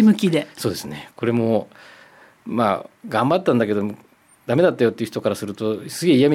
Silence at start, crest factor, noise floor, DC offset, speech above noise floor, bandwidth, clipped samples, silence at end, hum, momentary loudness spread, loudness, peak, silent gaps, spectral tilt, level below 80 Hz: 0 s; 16 dB; -49 dBFS; under 0.1%; 29 dB; 15.5 kHz; under 0.1%; 0 s; none; 12 LU; -21 LUFS; -6 dBFS; none; -6 dB/octave; -64 dBFS